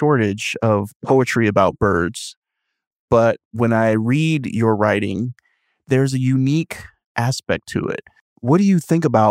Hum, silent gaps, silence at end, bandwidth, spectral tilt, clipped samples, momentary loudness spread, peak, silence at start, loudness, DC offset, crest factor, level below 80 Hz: none; 0.95-1.00 s, 2.37-2.42 s, 2.87-3.08 s, 3.45-3.51 s, 7.06-7.15 s, 8.21-8.36 s; 0 s; 15.5 kHz; -6.5 dB/octave; under 0.1%; 11 LU; 0 dBFS; 0 s; -18 LUFS; under 0.1%; 18 dB; -50 dBFS